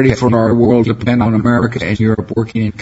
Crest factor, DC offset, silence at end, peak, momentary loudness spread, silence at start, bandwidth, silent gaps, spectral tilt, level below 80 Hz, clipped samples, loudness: 12 dB; under 0.1%; 0 s; 0 dBFS; 6 LU; 0 s; 8 kHz; none; -8 dB/octave; -36 dBFS; under 0.1%; -13 LUFS